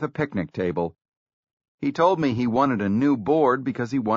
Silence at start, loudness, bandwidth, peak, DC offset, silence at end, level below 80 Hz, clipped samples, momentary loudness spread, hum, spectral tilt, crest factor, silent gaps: 0 s; -23 LUFS; 7.4 kHz; -8 dBFS; under 0.1%; 0 s; -58 dBFS; under 0.1%; 8 LU; none; -6.5 dB/octave; 16 dB; 1.08-1.26 s, 1.33-1.43 s, 1.53-1.57 s, 1.68-1.78 s